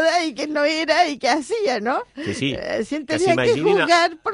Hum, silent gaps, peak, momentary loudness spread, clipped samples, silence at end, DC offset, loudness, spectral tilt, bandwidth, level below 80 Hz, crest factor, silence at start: none; none; -4 dBFS; 8 LU; under 0.1%; 0 s; under 0.1%; -20 LUFS; -4 dB/octave; 11 kHz; -56 dBFS; 16 dB; 0 s